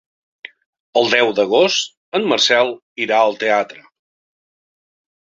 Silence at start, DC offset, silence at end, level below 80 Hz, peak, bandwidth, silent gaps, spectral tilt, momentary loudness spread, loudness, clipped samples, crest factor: 0.95 s; under 0.1%; 1.5 s; -66 dBFS; -2 dBFS; 7.8 kHz; 1.97-2.12 s, 2.82-2.96 s; -2.5 dB/octave; 8 LU; -16 LUFS; under 0.1%; 18 dB